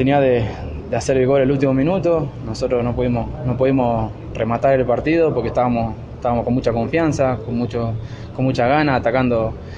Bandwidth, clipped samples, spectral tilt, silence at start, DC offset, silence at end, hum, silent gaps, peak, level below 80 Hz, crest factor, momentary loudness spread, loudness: 10 kHz; under 0.1%; -7.5 dB/octave; 0 s; under 0.1%; 0 s; none; none; -4 dBFS; -36 dBFS; 14 dB; 9 LU; -19 LUFS